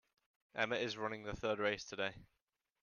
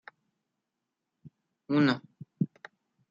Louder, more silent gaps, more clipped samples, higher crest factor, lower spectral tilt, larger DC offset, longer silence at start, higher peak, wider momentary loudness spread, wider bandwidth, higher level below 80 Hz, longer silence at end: second, -40 LUFS vs -30 LUFS; neither; neither; about the same, 22 dB vs 22 dB; second, -4 dB/octave vs -7.5 dB/octave; neither; second, 0.55 s vs 1.25 s; second, -20 dBFS vs -12 dBFS; second, 6 LU vs 9 LU; about the same, 7.2 kHz vs 7.4 kHz; first, -66 dBFS vs -80 dBFS; about the same, 0.55 s vs 0.65 s